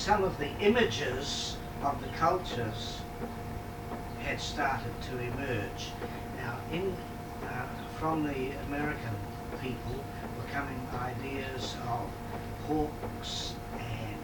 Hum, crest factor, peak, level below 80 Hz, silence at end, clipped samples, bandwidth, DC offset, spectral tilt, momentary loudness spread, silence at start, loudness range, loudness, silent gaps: none; 20 dB; -14 dBFS; -46 dBFS; 0 s; under 0.1%; 19 kHz; under 0.1%; -5 dB/octave; 10 LU; 0 s; 5 LU; -34 LUFS; none